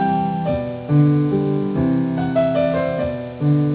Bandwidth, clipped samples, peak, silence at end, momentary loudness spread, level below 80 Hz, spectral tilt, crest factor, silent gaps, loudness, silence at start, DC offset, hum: 4 kHz; under 0.1%; -4 dBFS; 0 s; 7 LU; -42 dBFS; -12.5 dB/octave; 14 dB; none; -19 LUFS; 0 s; under 0.1%; none